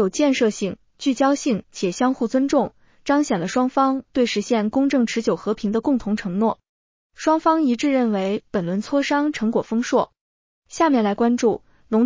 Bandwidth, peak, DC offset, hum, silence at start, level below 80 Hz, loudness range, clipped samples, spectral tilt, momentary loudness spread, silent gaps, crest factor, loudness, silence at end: 7.6 kHz; -6 dBFS; under 0.1%; none; 0 s; -56 dBFS; 1 LU; under 0.1%; -5 dB/octave; 6 LU; 6.69-7.10 s, 10.21-10.62 s; 14 dB; -21 LUFS; 0 s